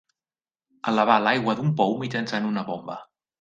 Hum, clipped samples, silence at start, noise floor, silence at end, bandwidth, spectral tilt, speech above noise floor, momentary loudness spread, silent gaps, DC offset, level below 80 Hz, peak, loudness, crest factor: none; under 0.1%; 0.85 s; under -90 dBFS; 0.35 s; 7.6 kHz; -6.5 dB/octave; over 67 dB; 14 LU; none; under 0.1%; -68 dBFS; -4 dBFS; -24 LUFS; 22 dB